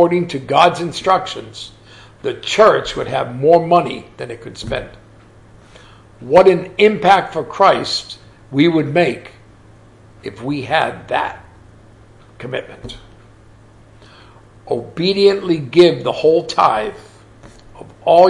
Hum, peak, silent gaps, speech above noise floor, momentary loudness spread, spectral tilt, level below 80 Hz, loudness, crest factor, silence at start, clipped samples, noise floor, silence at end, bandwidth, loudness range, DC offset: none; 0 dBFS; none; 29 dB; 21 LU; -5.5 dB/octave; -48 dBFS; -15 LUFS; 16 dB; 0 s; under 0.1%; -44 dBFS; 0 s; 11.5 kHz; 9 LU; under 0.1%